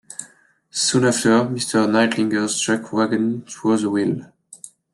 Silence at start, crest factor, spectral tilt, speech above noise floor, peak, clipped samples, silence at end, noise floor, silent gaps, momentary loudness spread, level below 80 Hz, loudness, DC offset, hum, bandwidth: 0.1 s; 16 dB; -4 dB/octave; 34 dB; -4 dBFS; under 0.1%; 0.25 s; -53 dBFS; none; 17 LU; -64 dBFS; -19 LUFS; under 0.1%; none; 12.5 kHz